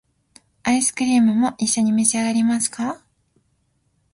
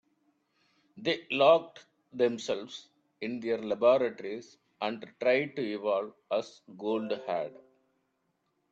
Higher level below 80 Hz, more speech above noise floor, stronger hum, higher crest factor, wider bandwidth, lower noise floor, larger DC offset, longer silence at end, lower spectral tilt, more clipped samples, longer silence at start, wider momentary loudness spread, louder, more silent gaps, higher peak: first, -60 dBFS vs -78 dBFS; about the same, 48 dB vs 48 dB; neither; about the same, 18 dB vs 22 dB; first, 11.5 kHz vs 7.8 kHz; second, -66 dBFS vs -78 dBFS; neither; about the same, 1.2 s vs 1.2 s; second, -3 dB/octave vs -5 dB/octave; neither; second, 0.65 s vs 0.95 s; second, 11 LU vs 16 LU; first, -19 LUFS vs -30 LUFS; neither; first, -2 dBFS vs -10 dBFS